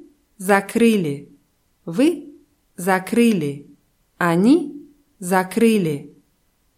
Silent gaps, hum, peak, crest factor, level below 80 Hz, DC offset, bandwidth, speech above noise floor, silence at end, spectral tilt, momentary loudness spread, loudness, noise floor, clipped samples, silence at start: none; none; -2 dBFS; 18 dB; -64 dBFS; under 0.1%; 16 kHz; 46 dB; 0.7 s; -6 dB/octave; 16 LU; -19 LUFS; -64 dBFS; under 0.1%; 0.4 s